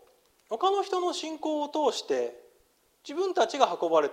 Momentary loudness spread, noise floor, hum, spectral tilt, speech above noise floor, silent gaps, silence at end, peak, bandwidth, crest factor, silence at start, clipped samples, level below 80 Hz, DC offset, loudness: 11 LU; -66 dBFS; none; -2.5 dB/octave; 39 dB; none; 0 s; -6 dBFS; 15.5 kHz; 22 dB; 0.5 s; under 0.1%; -78 dBFS; under 0.1%; -28 LUFS